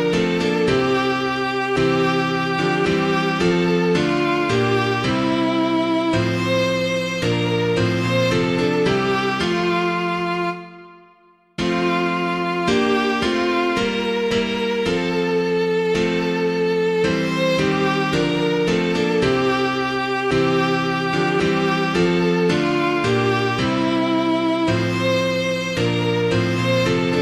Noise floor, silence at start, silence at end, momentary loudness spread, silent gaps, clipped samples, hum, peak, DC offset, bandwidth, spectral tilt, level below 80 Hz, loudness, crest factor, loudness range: -54 dBFS; 0 s; 0 s; 3 LU; none; under 0.1%; none; -6 dBFS; under 0.1%; 14 kHz; -6 dB/octave; -46 dBFS; -19 LUFS; 14 dB; 2 LU